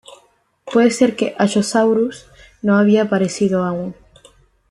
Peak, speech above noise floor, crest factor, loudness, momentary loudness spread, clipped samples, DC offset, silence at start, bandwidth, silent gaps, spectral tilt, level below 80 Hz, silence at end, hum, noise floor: -2 dBFS; 41 dB; 16 dB; -17 LUFS; 10 LU; under 0.1%; under 0.1%; 0.65 s; 12 kHz; none; -5.5 dB/octave; -56 dBFS; 0.8 s; none; -56 dBFS